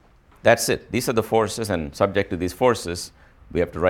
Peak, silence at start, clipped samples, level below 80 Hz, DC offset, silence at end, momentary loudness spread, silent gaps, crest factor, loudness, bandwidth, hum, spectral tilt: -2 dBFS; 0.45 s; under 0.1%; -46 dBFS; under 0.1%; 0 s; 10 LU; none; 20 dB; -22 LUFS; 18 kHz; none; -4.5 dB/octave